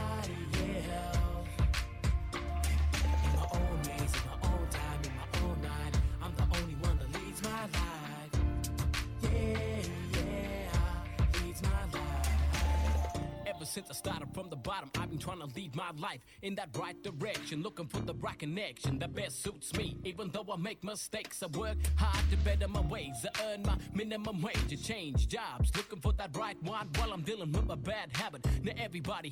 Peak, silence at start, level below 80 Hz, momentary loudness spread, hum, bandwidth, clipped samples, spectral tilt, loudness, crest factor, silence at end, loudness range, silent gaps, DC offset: -18 dBFS; 0 s; -38 dBFS; 8 LU; none; 16 kHz; under 0.1%; -5 dB/octave; -36 LUFS; 16 dB; 0 s; 6 LU; none; under 0.1%